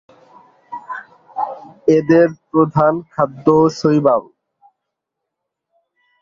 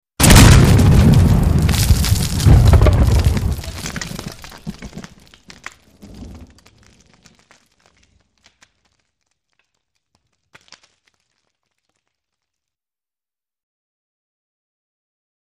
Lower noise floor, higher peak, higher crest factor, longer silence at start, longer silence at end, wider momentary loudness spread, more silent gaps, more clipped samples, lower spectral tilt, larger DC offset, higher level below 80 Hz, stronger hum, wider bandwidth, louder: second, -80 dBFS vs under -90 dBFS; about the same, 0 dBFS vs 0 dBFS; about the same, 18 dB vs 16 dB; first, 0.7 s vs 0.2 s; second, 2 s vs 9.25 s; second, 18 LU vs 25 LU; neither; neither; first, -8 dB/octave vs -5 dB/octave; neither; second, -58 dBFS vs -22 dBFS; neither; second, 7.4 kHz vs 15.5 kHz; second, -16 LUFS vs -12 LUFS